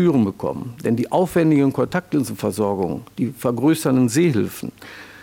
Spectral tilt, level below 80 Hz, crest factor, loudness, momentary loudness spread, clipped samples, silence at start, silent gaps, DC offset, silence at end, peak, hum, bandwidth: -6.5 dB/octave; -56 dBFS; 14 dB; -20 LUFS; 10 LU; under 0.1%; 0 s; none; under 0.1%; 0 s; -6 dBFS; none; 17.5 kHz